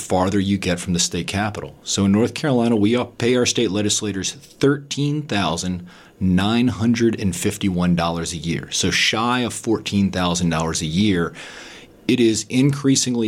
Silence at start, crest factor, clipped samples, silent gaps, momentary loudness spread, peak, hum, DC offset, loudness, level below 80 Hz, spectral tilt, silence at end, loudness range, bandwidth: 0 s; 14 dB; under 0.1%; none; 8 LU; -6 dBFS; none; under 0.1%; -20 LUFS; -48 dBFS; -4.5 dB/octave; 0 s; 2 LU; 16 kHz